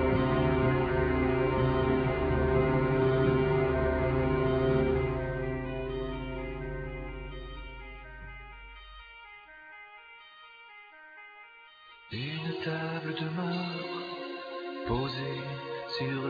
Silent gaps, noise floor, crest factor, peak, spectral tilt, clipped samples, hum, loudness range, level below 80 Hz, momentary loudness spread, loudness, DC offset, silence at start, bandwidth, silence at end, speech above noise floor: none; -54 dBFS; 16 dB; -14 dBFS; -9 dB/octave; under 0.1%; none; 20 LU; -42 dBFS; 22 LU; -30 LUFS; under 0.1%; 0 s; 5 kHz; 0 s; 20 dB